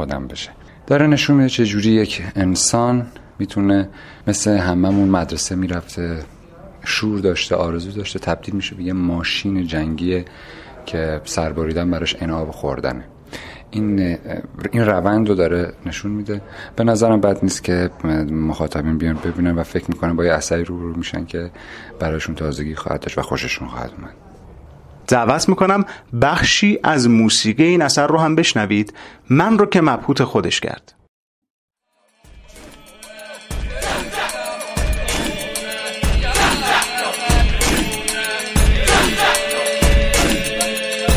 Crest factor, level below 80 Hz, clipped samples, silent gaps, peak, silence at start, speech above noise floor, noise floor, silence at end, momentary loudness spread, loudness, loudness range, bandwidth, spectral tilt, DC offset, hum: 18 dB; -28 dBFS; under 0.1%; 31.08-31.42 s, 31.50-31.68 s; 0 dBFS; 0 s; 44 dB; -62 dBFS; 0 s; 14 LU; -18 LUFS; 9 LU; 16 kHz; -4.5 dB/octave; under 0.1%; none